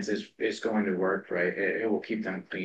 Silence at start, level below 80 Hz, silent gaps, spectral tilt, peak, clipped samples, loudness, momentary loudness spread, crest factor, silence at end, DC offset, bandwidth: 0 s; -78 dBFS; none; -6 dB/octave; -14 dBFS; under 0.1%; -30 LUFS; 5 LU; 14 dB; 0 s; under 0.1%; 9 kHz